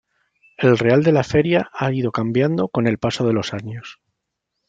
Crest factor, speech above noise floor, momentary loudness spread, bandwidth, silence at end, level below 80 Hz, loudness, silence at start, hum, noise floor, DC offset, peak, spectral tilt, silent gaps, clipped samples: 18 dB; 60 dB; 13 LU; 8.8 kHz; 0.75 s; -52 dBFS; -19 LUFS; 0.6 s; none; -78 dBFS; under 0.1%; -2 dBFS; -7 dB/octave; none; under 0.1%